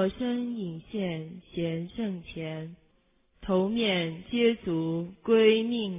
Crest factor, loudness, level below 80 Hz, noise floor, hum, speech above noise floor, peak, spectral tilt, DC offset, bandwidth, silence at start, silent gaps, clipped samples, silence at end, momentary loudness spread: 18 dB; -28 LUFS; -58 dBFS; -67 dBFS; none; 39 dB; -10 dBFS; -10 dB/octave; under 0.1%; 3.8 kHz; 0 s; none; under 0.1%; 0 s; 15 LU